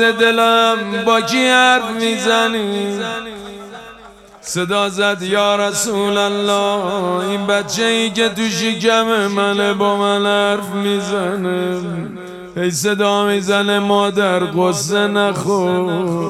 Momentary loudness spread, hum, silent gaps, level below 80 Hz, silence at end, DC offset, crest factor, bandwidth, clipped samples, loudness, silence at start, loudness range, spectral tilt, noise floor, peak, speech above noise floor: 10 LU; none; none; -56 dBFS; 0 s; under 0.1%; 16 dB; 15.5 kHz; under 0.1%; -16 LUFS; 0 s; 4 LU; -3.5 dB/octave; -40 dBFS; 0 dBFS; 25 dB